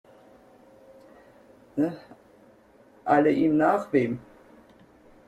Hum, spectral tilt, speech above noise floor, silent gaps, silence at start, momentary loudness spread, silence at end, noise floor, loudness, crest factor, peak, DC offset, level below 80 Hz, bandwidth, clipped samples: none; -8 dB/octave; 33 dB; none; 1.75 s; 16 LU; 1.1 s; -56 dBFS; -25 LUFS; 22 dB; -6 dBFS; under 0.1%; -66 dBFS; 8.8 kHz; under 0.1%